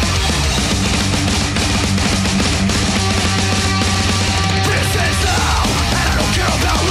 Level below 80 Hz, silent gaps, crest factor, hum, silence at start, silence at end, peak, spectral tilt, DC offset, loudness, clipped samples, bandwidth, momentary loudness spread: -24 dBFS; none; 12 dB; none; 0 s; 0 s; -4 dBFS; -3.5 dB/octave; under 0.1%; -15 LUFS; under 0.1%; 15.5 kHz; 1 LU